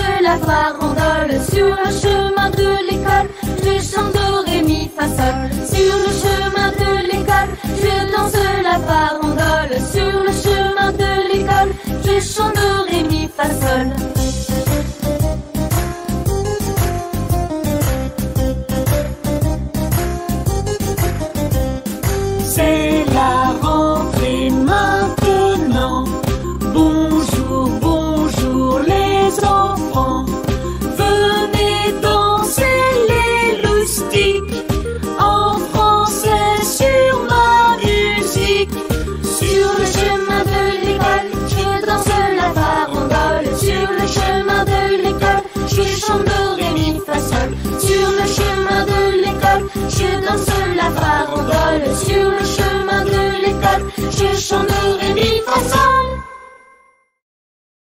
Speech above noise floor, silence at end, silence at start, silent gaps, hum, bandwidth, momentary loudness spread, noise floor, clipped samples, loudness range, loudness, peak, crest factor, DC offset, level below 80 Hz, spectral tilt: 38 dB; 1.5 s; 0 s; none; none; 16.5 kHz; 6 LU; -53 dBFS; under 0.1%; 5 LU; -16 LUFS; -2 dBFS; 14 dB; under 0.1%; -26 dBFS; -5 dB/octave